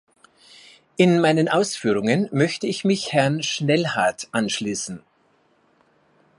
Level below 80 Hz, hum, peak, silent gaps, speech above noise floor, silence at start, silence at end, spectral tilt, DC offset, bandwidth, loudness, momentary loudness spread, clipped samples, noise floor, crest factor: -66 dBFS; none; -4 dBFS; none; 41 dB; 1 s; 1.4 s; -5 dB/octave; under 0.1%; 11.5 kHz; -21 LUFS; 9 LU; under 0.1%; -62 dBFS; 20 dB